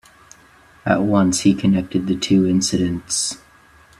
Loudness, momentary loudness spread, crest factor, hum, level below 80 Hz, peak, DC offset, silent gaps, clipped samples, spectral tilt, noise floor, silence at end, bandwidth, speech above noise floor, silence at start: -18 LUFS; 7 LU; 18 dB; none; -50 dBFS; 0 dBFS; under 0.1%; none; under 0.1%; -4.5 dB/octave; -50 dBFS; 0.65 s; 13 kHz; 32 dB; 0.85 s